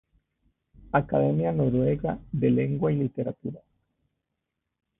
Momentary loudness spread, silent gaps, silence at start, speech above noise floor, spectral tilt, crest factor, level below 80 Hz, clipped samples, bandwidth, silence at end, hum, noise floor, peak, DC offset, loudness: 9 LU; none; 0.95 s; 58 dB; -13 dB/octave; 20 dB; -52 dBFS; under 0.1%; 3.8 kHz; 1.4 s; none; -83 dBFS; -8 dBFS; under 0.1%; -26 LUFS